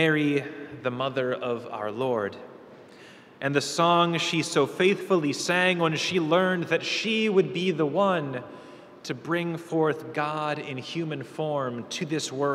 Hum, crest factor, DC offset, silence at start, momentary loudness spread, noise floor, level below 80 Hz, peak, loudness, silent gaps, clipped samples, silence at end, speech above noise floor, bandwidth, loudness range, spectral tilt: none; 18 dB; under 0.1%; 0 s; 11 LU; -49 dBFS; -74 dBFS; -8 dBFS; -26 LUFS; none; under 0.1%; 0 s; 23 dB; 14.5 kHz; 6 LU; -4.5 dB/octave